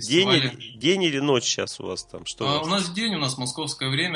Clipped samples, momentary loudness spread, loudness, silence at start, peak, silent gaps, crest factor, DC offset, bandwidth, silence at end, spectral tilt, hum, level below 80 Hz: under 0.1%; 11 LU; -23 LUFS; 0 s; -6 dBFS; none; 18 dB; under 0.1%; 11 kHz; 0 s; -3.5 dB/octave; none; -62 dBFS